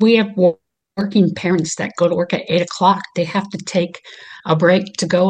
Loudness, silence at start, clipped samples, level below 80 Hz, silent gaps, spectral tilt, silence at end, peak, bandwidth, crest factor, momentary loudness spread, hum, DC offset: -17 LUFS; 0 s; under 0.1%; -62 dBFS; none; -5.5 dB/octave; 0 s; -2 dBFS; 9.4 kHz; 16 dB; 13 LU; none; under 0.1%